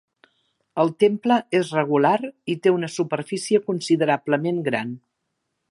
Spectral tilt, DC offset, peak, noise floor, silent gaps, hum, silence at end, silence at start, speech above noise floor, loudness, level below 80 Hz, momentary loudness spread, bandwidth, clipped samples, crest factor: -5.5 dB/octave; under 0.1%; -4 dBFS; -77 dBFS; none; none; 0.75 s; 0.75 s; 56 dB; -22 LUFS; -74 dBFS; 8 LU; 11.5 kHz; under 0.1%; 18 dB